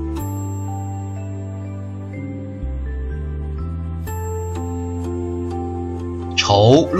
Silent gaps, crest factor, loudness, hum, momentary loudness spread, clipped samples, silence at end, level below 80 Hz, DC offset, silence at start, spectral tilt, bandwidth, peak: none; 20 dB; -23 LUFS; none; 12 LU; under 0.1%; 0 s; -32 dBFS; under 0.1%; 0 s; -6 dB/octave; 14 kHz; -2 dBFS